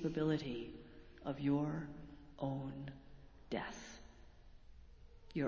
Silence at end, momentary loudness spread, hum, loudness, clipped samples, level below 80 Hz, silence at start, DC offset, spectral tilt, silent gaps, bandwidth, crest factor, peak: 0 s; 22 LU; none; -42 LUFS; under 0.1%; -62 dBFS; 0 s; under 0.1%; -7 dB/octave; none; 7.4 kHz; 18 dB; -26 dBFS